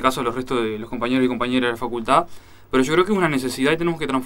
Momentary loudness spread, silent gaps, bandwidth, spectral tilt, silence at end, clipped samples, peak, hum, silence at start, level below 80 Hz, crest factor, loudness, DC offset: 7 LU; none; 16.5 kHz; -5 dB/octave; 0 s; under 0.1%; -2 dBFS; none; 0 s; -46 dBFS; 18 dB; -21 LUFS; under 0.1%